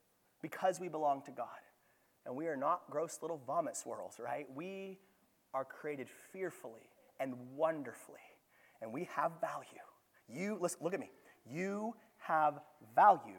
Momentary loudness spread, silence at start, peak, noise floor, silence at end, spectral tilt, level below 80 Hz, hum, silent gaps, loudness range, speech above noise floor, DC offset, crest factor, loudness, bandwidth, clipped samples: 17 LU; 0.45 s; -16 dBFS; -74 dBFS; 0 s; -5 dB/octave; under -90 dBFS; none; none; 5 LU; 35 dB; under 0.1%; 24 dB; -39 LUFS; 19 kHz; under 0.1%